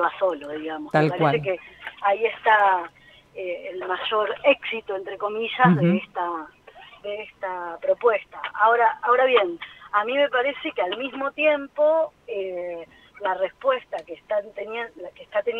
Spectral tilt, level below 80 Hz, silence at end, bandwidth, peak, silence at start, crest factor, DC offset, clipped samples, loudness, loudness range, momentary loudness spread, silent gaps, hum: -7.5 dB/octave; -66 dBFS; 0 s; 7.8 kHz; -4 dBFS; 0 s; 20 dB; under 0.1%; under 0.1%; -23 LUFS; 4 LU; 15 LU; none; none